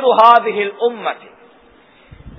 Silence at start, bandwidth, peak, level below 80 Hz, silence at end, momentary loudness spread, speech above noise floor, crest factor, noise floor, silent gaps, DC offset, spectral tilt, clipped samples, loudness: 0 s; 5.4 kHz; 0 dBFS; -50 dBFS; 0.1 s; 16 LU; 34 dB; 16 dB; -48 dBFS; none; under 0.1%; -6 dB/octave; 0.3%; -14 LUFS